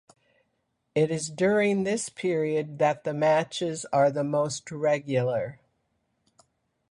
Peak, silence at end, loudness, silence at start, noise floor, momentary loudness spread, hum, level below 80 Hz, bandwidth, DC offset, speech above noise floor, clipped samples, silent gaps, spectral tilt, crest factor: -10 dBFS; 1.35 s; -26 LUFS; 0.95 s; -76 dBFS; 7 LU; none; -68 dBFS; 11.5 kHz; under 0.1%; 50 dB; under 0.1%; none; -5 dB/octave; 16 dB